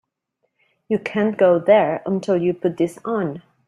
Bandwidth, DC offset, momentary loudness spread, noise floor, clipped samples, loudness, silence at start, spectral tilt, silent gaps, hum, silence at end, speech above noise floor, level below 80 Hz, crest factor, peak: 12 kHz; under 0.1%; 9 LU; -73 dBFS; under 0.1%; -20 LUFS; 0.9 s; -7.5 dB/octave; none; none; 0.3 s; 54 dB; -64 dBFS; 18 dB; -2 dBFS